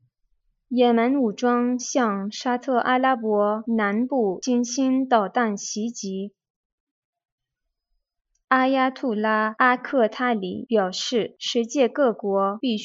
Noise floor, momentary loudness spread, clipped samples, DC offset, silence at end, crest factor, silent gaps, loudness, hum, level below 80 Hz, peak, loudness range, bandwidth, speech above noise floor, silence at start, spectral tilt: -82 dBFS; 7 LU; under 0.1%; under 0.1%; 0 s; 18 dB; 6.50-7.13 s, 7.32-7.38 s, 8.44-8.48 s; -22 LUFS; none; -76 dBFS; -4 dBFS; 5 LU; 7.8 kHz; 59 dB; 0.7 s; -4 dB/octave